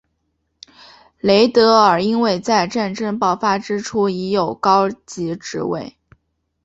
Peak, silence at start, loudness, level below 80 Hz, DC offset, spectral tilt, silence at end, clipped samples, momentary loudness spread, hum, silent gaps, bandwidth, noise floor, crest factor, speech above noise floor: 0 dBFS; 1.25 s; -17 LUFS; -56 dBFS; under 0.1%; -5 dB/octave; 0.75 s; under 0.1%; 13 LU; none; none; 8.2 kHz; -70 dBFS; 18 dB; 53 dB